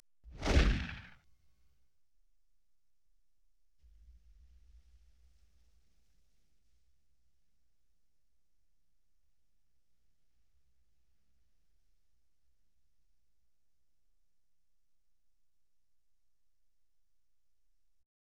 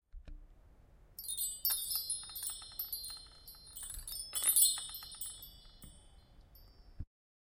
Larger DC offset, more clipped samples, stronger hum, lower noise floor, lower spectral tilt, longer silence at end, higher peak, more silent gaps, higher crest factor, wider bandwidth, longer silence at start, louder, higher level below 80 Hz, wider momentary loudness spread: neither; neither; neither; first, -84 dBFS vs -61 dBFS; first, -5.5 dB/octave vs 1 dB/octave; first, 17.35 s vs 0.45 s; about the same, -14 dBFS vs -12 dBFS; neither; about the same, 30 dB vs 28 dB; second, 9.4 kHz vs 17 kHz; about the same, 0.25 s vs 0.15 s; about the same, -34 LUFS vs -35 LUFS; first, -46 dBFS vs -58 dBFS; first, 28 LU vs 25 LU